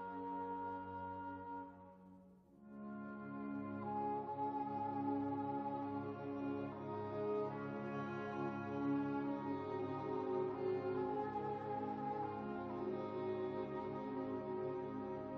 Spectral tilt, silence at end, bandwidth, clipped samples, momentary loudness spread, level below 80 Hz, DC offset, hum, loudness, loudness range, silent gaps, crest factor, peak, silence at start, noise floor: -7 dB/octave; 0 s; 6.2 kHz; under 0.1%; 9 LU; -74 dBFS; under 0.1%; none; -43 LUFS; 6 LU; none; 14 dB; -28 dBFS; 0 s; -63 dBFS